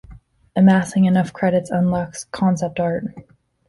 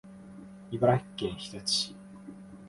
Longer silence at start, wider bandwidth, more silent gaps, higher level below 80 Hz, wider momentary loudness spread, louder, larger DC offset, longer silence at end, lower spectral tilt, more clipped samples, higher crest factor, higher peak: about the same, 0.1 s vs 0.05 s; about the same, 11.5 kHz vs 11.5 kHz; neither; first, -50 dBFS vs -60 dBFS; second, 12 LU vs 22 LU; first, -19 LUFS vs -30 LUFS; neither; first, 0.45 s vs 0 s; first, -7 dB/octave vs -4.5 dB/octave; neither; second, 16 dB vs 22 dB; first, -4 dBFS vs -12 dBFS